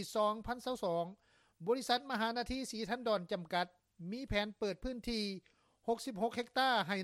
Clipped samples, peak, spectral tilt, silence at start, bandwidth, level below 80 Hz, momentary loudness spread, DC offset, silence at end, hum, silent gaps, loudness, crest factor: under 0.1%; -18 dBFS; -4 dB/octave; 0 s; 16 kHz; -58 dBFS; 11 LU; under 0.1%; 0 s; none; none; -38 LUFS; 20 dB